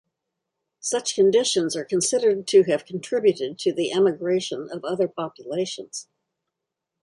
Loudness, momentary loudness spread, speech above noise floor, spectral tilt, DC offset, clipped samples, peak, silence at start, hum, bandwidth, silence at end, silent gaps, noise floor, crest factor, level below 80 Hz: -23 LUFS; 12 LU; 61 dB; -3.5 dB/octave; under 0.1%; under 0.1%; -6 dBFS; 0.85 s; none; 11.5 kHz; 1 s; none; -84 dBFS; 18 dB; -72 dBFS